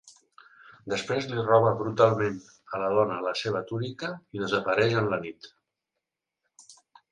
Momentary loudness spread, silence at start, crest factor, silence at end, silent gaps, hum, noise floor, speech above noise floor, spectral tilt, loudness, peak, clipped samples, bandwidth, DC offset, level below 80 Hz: 14 LU; 0.05 s; 22 dB; 0.4 s; none; none; -85 dBFS; 59 dB; -6 dB/octave; -27 LUFS; -6 dBFS; under 0.1%; 10.5 kHz; under 0.1%; -64 dBFS